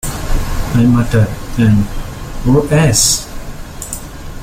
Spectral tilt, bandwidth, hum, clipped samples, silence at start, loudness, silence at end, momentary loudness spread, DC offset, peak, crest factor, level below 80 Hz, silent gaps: -5 dB/octave; 16.5 kHz; none; under 0.1%; 0.05 s; -13 LUFS; 0 s; 18 LU; under 0.1%; 0 dBFS; 14 dB; -22 dBFS; none